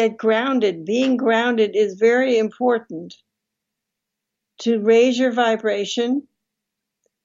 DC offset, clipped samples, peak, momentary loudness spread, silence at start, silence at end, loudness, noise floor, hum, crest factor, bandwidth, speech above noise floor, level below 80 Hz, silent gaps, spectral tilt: under 0.1%; under 0.1%; -6 dBFS; 8 LU; 0 s; 1 s; -19 LUFS; -82 dBFS; none; 14 dB; 7.8 kHz; 64 dB; -80 dBFS; none; -4.5 dB/octave